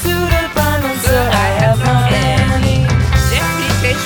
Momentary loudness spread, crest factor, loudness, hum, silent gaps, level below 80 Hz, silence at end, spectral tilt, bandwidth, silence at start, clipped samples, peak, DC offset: 2 LU; 12 dB; -13 LUFS; none; none; -22 dBFS; 0 s; -5 dB/octave; over 20 kHz; 0 s; under 0.1%; 0 dBFS; under 0.1%